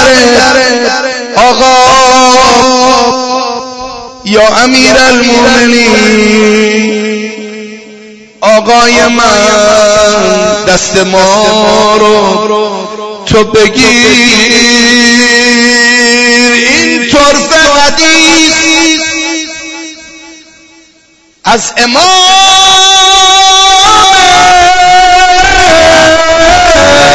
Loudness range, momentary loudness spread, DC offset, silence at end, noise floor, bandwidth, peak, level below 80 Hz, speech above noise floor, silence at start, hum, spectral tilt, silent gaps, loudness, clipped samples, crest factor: 5 LU; 10 LU; under 0.1%; 0 s; -44 dBFS; 11 kHz; 0 dBFS; -28 dBFS; 39 dB; 0 s; none; -2 dB/octave; none; -4 LUFS; 7%; 4 dB